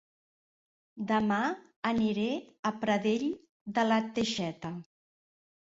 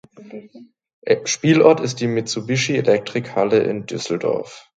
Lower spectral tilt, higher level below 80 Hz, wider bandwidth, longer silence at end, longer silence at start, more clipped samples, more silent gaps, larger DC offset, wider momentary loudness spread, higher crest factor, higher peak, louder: about the same, -5 dB/octave vs -5 dB/octave; second, -68 dBFS vs -62 dBFS; second, 7.8 kHz vs 9.2 kHz; first, 0.95 s vs 0.15 s; first, 0.95 s vs 0.2 s; neither; first, 1.76-1.83 s, 2.59-2.63 s, 3.49-3.66 s vs 0.93-1.02 s; neither; second, 13 LU vs 21 LU; about the same, 18 dB vs 18 dB; second, -14 dBFS vs 0 dBFS; second, -31 LUFS vs -19 LUFS